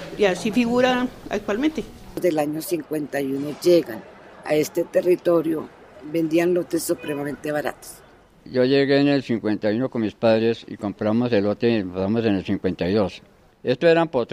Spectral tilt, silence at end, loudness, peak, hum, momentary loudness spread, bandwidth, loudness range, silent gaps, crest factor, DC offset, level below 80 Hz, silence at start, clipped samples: -6 dB/octave; 0 s; -22 LUFS; -4 dBFS; none; 11 LU; 16 kHz; 2 LU; none; 16 dB; under 0.1%; -54 dBFS; 0 s; under 0.1%